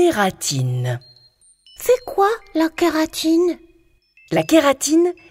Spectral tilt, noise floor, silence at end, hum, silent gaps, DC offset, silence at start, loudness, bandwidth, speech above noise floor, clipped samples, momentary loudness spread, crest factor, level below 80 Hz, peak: -5 dB/octave; -56 dBFS; 0.2 s; none; none; under 0.1%; 0 s; -18 LUFS; 16 kHz; 38 dB; under 0.1%; 9 LU; 18 dB; -52 dBFS; -2 dBFS